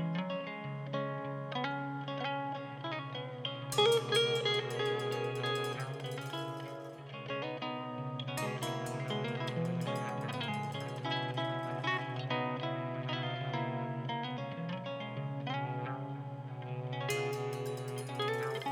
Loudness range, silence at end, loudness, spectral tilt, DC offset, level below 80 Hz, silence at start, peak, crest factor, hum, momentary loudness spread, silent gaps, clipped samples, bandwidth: 6 LU; 0 s; -37 LUFS; -5 dB/octave; under 0.1%; -78 dBFS; 0 s; -16 dBFS; 20 dB; none; 8 LU; none; under 0.1%; 17.5 kHz